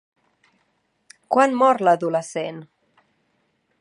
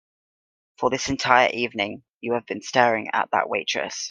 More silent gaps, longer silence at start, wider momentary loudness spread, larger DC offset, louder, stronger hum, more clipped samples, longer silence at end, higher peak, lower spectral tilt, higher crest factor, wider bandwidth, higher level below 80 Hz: second, none vs 2.14-2.21 s; first, 1.3 s vs 0.8 s; first, 14 LU vs 10 LU; neither; first, -20 LUFS vs -23 LUFS; neither; neither; first, 1.15 s vs 0 s; about the same, -2 dBFS vs 0 dBFS; first, -5 dB/octave vs -3 dB/octave; about the same, 22 dB vs 24 dB; about the same, 11 kHz vs 10 kHz; second, -80 dBFS vs -56 dBFS